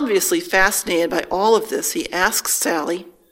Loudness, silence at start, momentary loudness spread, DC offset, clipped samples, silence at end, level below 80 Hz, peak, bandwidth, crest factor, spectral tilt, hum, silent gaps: -18 LUFS; 0 s; 6 LU; under 0.1%; under 0.1%; 0.2 s; -46 dBFS; 0 dBFS; 16.5 kHz; 18 dB; -2 dB/octave; none; none